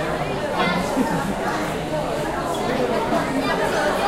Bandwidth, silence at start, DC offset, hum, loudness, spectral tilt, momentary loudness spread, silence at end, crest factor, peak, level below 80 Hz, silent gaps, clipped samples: 16 kHz; 0 s; under 0.1%; none; -22 LUFS; -5 dB/octave; 4 LU; 0 s; 14 dB; -8 dBFS; -40 dBFS; none; under 0.1%